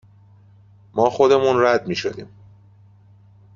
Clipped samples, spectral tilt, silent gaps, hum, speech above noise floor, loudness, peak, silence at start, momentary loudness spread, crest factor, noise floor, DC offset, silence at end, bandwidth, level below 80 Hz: under 0.1%; -5.5 dB/octave; none; none; 32 dB; -18 LUFS; -2 dBFS; 0.95 s; 14 LU; 18 dB; -50 dBFS; under 0.1%; 1.3 s; 7.4 kHz; -58 dBFS